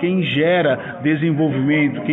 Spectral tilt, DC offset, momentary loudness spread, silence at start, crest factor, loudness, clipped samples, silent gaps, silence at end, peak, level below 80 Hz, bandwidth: -9.5 dB/octave; under 0.1%; 4 LU; 0 s; 12 dB; -18 LUFS; under 0.1%; none; 0 s; -6 dBFS; -60 dBFS; 4 kHz